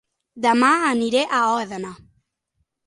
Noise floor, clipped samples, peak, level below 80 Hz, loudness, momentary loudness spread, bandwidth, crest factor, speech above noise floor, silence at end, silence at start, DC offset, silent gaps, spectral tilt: -73 dBFS; under 0.1%; -4 dBFS; -64 dBFS; -19 LUFS; 15 LU; 11.5 kHz; 18 dB; 54 dB; 0.9 s; 0.35 s; under 0.1%; none; -3.5 dB/octave